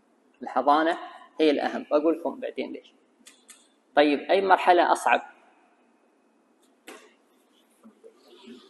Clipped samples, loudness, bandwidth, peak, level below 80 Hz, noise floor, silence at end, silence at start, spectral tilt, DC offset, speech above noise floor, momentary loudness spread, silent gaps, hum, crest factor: under 0.1%; -24 LUFS; 12.5 kHz; -4 dBFS; -80 dBFS; -64 dBFS; 0.15 s; 0.4 s; -3.5 dB/octave; under 0.1%; 41 dB; 15 LU; none; none; 24 dB